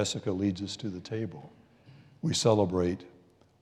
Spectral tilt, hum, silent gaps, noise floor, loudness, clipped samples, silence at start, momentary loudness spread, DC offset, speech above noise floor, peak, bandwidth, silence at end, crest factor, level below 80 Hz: -5 dB/octave; none; none; -56 dBFS; -30 LUFS; under 0.1%; 0 s; 14 LU; under 0.1%; 26 dB; -12 dBFS; 13.5 kHz; 0.5 s; 20 dB; -68 dBFS